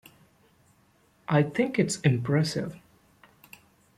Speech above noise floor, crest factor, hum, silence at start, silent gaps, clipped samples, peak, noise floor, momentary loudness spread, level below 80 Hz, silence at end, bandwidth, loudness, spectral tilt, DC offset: 39 dB; 20 dB; none; 1.3 s; none; under 0.1%; -8 dBFS; -64 dBFS; 11 LU; -64 dBFS; 1.2 s; 14.5 kHz; -26 LUFS; -6 dB/octave; under 0.1%